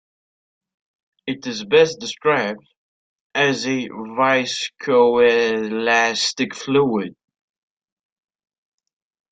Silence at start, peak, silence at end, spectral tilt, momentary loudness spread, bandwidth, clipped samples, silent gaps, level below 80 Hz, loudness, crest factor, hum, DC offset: 1.25 s; -2 dBFS; 2.2 s; -3.5 dB/octave; 12 LU; 9.2 kHz; under 0.1%; 2.77-3.30 s; -64 dBFS; -19 LUFS; 18 dB; none; under 0.1%